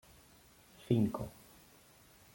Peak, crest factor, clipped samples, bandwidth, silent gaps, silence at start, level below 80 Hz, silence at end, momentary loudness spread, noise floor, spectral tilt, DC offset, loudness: -16 dBFS; 22 dB; under 0.1%; 16.5 kHz; none; 0.9 s; -64 dBFS; 1.05 s; 26 LU; -63 dBFS; -8 dB/octave; under 0.1%; -35 LUFS